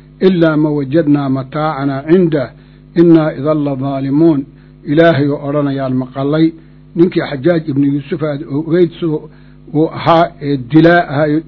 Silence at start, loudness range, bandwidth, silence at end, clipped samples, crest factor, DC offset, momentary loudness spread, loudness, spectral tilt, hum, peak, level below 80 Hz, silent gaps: 0.2 s; 2 LU; 6 kHz; 0.05 s; 0.5%; 12 dB; under 0.1%; 9 LU; -13 LUFS; -10 dB/octave; none; 0 dBFS; -44 dBFS; none